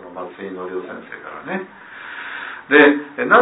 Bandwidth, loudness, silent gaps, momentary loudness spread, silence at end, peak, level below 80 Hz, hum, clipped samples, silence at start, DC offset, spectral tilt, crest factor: 4 kHz; -17 LUFS; none; 21 LU; 0 s; 0 dBFS; -64 dBFS; none; under 0.1%; 0 s; under 0.1%; -8 dB/octave; 20 dB